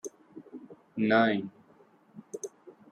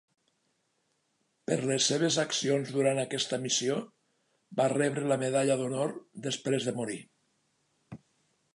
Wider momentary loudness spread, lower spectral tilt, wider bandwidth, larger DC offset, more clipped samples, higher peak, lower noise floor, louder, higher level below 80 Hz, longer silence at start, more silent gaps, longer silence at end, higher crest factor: first, 24 LU vs 10 LU; about the same, -5 dB/octave vs -4 dB/octave; first, 13.5 kHz vs 11.5 kHz; neither; neither; first, -10 dBFS vs -14 dBFS; second, -61 dBFS vs -76 dBFS; about the same, -28 LUFS vs -30 LUFS; about the same, -80 dBFS vs -78 dBFS; second, 0.05 s vs 1.5 s; neither; second, 0.2 s vs 0.6 s; about the same, 22 dB vs 18 dB